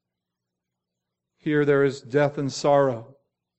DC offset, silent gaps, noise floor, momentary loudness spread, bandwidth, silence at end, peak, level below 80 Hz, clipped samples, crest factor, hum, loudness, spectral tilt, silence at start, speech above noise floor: under 0.1%; none; -84 dBFS; 7 LU; 8.4 kHz; 0.55 s; -8 dBFS; -66 dBFS; under 0.1%; 18 dB; 60 Hz at -55 dBFS; -22 LUFS; -6 dB/octave; 1.45 s; 62 dB